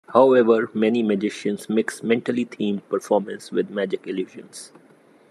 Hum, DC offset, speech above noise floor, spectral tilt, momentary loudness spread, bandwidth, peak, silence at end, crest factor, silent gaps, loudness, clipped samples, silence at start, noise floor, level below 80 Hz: none; under 0.1%; 32 dB; -6 dB/octave; 14 LU; 13 kHz; -2 dBFS; 0.65 s; 20 dB; none; -22 LUFS; under 0.1%; 0.1 s; -53 dBFS; -76 dBFS